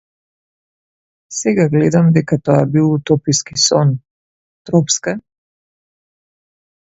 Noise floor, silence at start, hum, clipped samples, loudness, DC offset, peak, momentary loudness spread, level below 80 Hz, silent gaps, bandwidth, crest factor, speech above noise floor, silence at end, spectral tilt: under -90 dBFS; 1.3 s; none; under 0.1%; -14 LUFS; under 0.1%; 0 dBFS; 9 LU; -52 dBFS; 4.11-4.65 s; 8 kHz; 16 dB; over 76 dB; 1.65 s; -5 dB/octave